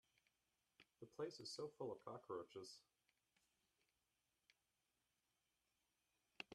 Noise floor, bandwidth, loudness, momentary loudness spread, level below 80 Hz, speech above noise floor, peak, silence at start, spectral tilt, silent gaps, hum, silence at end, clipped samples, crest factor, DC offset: -90 dBFS; 12.5 kHz; -54 LUFS; 11 LU; under -90 dBFS; 36 dB; -34 dBFS; 0.8 s; -4 dB/octave; none; none; 0 s; under 0.1%; 24 dB; under 0.1%